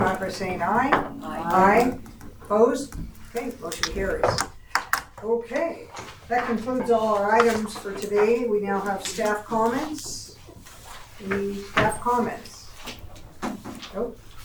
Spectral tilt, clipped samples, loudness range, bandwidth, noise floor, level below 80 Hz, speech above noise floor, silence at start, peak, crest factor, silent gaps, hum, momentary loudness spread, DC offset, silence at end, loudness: -4.5 dB/octave; under 0.1%; 5 LU; over 20 kHz; -45 dBFS; -46 dBFS; 21 dB; 0 s; -2 dBFS; 22 dB; none; none; 18 LU; under 0.1%; 0 s; -24 LUFS